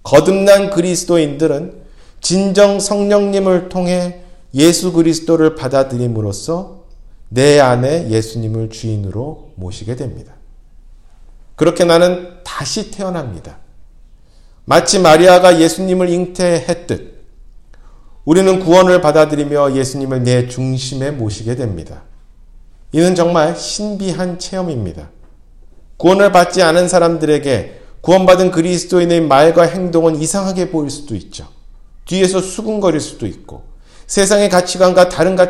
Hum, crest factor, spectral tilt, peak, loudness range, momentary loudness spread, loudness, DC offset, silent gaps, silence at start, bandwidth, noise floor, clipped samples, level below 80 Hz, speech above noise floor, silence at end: none; 14 dB; -5 dB/octave; 0 dBFS; 7 LU; 15 LU; -13 LUFS; under 0.1%; none; 0.05 s; 16 kHz; -42 dBFS; 0.2%; -38 dBFS; 30 dB; 0 s